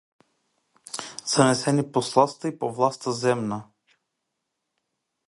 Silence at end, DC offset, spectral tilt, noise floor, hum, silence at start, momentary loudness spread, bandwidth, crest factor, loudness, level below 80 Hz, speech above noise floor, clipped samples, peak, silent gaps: 1.65 s; under 0.1%; -4.5 dB/octave; -80 dBFS; none; 0.95 s; 14 LU; 11.5 kHz; 24 dB; -24 LUFS; -66 dBFS; 57 dB; under 0.1%; -2 dBFS; none